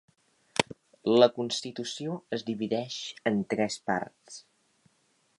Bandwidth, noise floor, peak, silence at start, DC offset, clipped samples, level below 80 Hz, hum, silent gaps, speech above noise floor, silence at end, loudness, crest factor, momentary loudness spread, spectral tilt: 11.5 kHz; -70 dBFS; -6 dBFS; 0.6 s; under 0.1%; under 0.1%; -72 dBFS; none; none; 41 dB; 1 s; -29 LUFS; 26 dB; 14 LU; -4.5 dB/octave